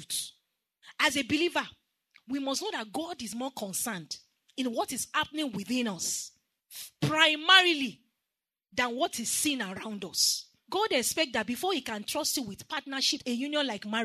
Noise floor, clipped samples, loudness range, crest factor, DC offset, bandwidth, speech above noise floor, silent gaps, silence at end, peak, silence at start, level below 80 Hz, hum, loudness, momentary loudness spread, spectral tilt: -89 dBFS; under 0.1%; 7 LU; 26 dB; under 0.1%; 13.5 kHz; 59 dB; none; 0 s; -6 dBFS; 0 s; -70 dBFS; none; -29 LUFS; 13 LU; -2 dB/octave